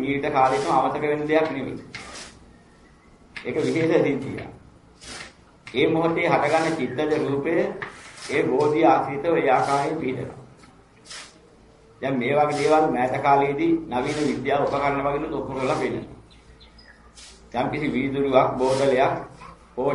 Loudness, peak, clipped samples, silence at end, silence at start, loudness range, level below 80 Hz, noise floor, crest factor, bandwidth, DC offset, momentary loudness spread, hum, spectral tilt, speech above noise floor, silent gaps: -22 LUFS; -4 dBFS; under 0.1%; 0 s; 0 s; 5 LU; -54 dBFS; -52 dBFS; 20 dB; 11.5 kHz; under 0.1%; 18 LU; none; -6 dB/octave; 30 dB; none